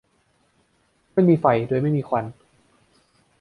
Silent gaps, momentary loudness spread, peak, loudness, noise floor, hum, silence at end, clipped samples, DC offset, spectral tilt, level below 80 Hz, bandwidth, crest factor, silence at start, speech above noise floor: none; 9 LU; -4 dBFS; -21 LUFS; -65 dBFS; none; 1.1 s; under 0.1%; under 0.1%; -10 dB/octave; -62 dBFS; 5.2 kHz; 20 dB; 1.15 s; 45 dB